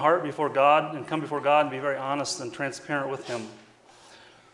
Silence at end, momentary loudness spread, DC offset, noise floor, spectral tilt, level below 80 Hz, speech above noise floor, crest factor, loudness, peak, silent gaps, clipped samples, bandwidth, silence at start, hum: 0.35 s; 12 LU; under 0.1%; -54 dBFS; -4 dB/octave; -74 dBFS; 28 dB; 20 dB; -26 LUFS; -6 dBFS; none; under 0.1%; 11.5 kHz; 0 s; none